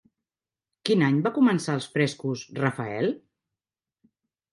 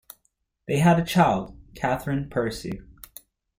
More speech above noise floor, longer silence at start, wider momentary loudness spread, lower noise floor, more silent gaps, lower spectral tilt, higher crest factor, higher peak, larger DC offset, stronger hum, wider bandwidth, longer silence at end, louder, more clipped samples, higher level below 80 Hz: first, over 66 dB vs 49 dB; first, 0.85 s vs 0.7 s; second, 10 LU vs 24 LU; first, under -90 dBFS vs -72 dBFS; neither; about the same, -6 dB/octave vs -6.5 dB/octave; about the same, 20 dB vs 20 dB; about the same, -6 dBFS vs -6 dBFS; neither; neither; second, 11.5 kHz vs 16.5 kHz; first, 1.35 s vs 0.75 s; about the same, -25 LUFS vs -24 LUFS; neither; second, -70 dBFS vs -48 dBFS